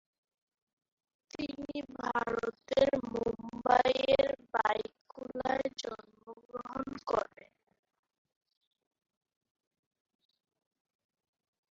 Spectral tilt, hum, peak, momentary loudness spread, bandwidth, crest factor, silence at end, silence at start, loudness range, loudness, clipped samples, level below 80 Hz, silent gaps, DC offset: -2.5 dB/octave; none; -12 dBFS; 17 LU; 7.6 kHz; 24 dB; 4.5 s; 1.35 s; 11 LU; -33 LUFS; under 0.1%; -64 dBFS; 5.01-5.05 s, 6.45-6.49 s; under 0.1%